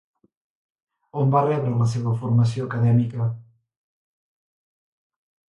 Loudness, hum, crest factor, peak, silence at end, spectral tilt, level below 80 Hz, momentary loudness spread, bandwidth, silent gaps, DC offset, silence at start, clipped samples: -22 LUFS; none; 18 dB; -6 dBFS; 2.05 s; -8.5 dB/octave; -58 dBFS; 8 LU; 9 kHz; none; under 0.1%; 1.15 s; under 0.1%